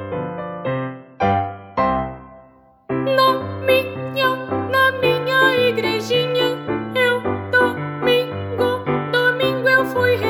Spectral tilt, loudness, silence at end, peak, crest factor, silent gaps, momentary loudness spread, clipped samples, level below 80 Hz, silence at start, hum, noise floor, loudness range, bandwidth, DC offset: -5.5 dB/octave; -19 LUFS; 0 s; -2 dBFS; 18 dB; none; 10 LU; under 0.1%; -50 dBFS; 0 s; none; -49 dBFS; 4 LU; over 20 kHz; under 0.1%